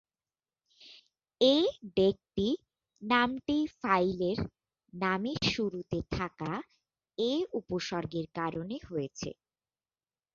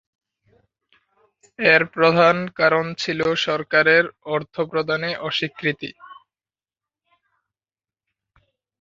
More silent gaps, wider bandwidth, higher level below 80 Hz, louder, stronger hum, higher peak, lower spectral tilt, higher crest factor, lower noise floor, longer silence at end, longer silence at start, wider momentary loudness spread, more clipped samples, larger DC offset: neither; about the same, 7.6 kHz vs 7.6 kHz; first, -58 dBFS vs -64 dBFS; second, -32 LUFS vs -19 LUFS; neither; second, -12 dBFS vs -2 dBFS; about the same, -5.5 dB/octave vs -5 dB/octave; about the same, 20 dB vs 20 dB; about the same, under -90 dBFS vs under -90 dBFS; second, 1.05 s vs 2.65 s; second, 0.8 s vs 1.6 s; about the same, 11 LU vs 10 LU; neither; neither